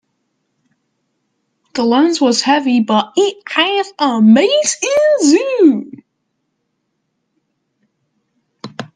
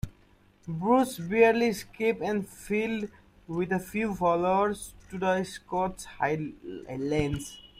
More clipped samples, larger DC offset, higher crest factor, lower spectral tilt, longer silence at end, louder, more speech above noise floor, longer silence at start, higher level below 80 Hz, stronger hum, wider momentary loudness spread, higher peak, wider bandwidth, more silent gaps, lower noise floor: neither; neither; about the same, 16 dB vs 20 dB; second, -3.5 dB/octave vs -6 dB/octave; about the same, 0.1 s vs 0.15 s; first, -13 LUFS vs -28 LUFS; first, 57 dB vs 32 dB; first, 1.75 s vs 0.05 s; second, -68 dBFS vs -52 dBFS; neither; about the same, 13 LU vs 15 LU; first, 0 dBFS vs -8 dBFS; second, 10 kHz vs 16 kHz; neither; first, -70 dBFS vs -60 dBFS